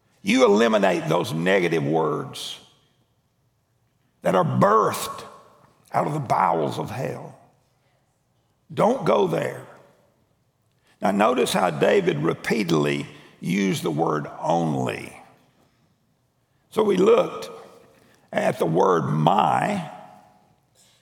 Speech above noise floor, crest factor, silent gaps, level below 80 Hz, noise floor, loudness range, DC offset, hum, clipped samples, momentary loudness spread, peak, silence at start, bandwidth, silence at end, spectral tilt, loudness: 46 dB; 22 dB; none; -68 dBFS; -68 dBFS; 5 LU; under 0.1%; none; under 0.1%; 16 LU; -2 dBFS; 0.25 s; over 20 kHz; 0.95 s; -5.5 dB/octave; -22 LUFS